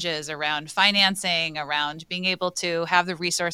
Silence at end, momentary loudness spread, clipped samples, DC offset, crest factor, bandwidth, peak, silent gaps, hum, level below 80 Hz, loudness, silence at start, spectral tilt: 0 s; 8 LU; under 0.1%; under 0.1%; 22 dB; 16.5 kHz; -2 dBFS; none; none; -66 dBFS; -23 LUFS; 0 s; -2 dB/octave